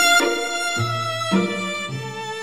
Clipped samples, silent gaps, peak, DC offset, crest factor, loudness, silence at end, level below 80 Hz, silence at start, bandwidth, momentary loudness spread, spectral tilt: under 0.1%; none; -4 dBFS; under 0.1%; 18 dB; -22 LUFS; 0 s; -62 dBFS; 0 s; 16.5 kHz; 11 LU; -3 dB/octave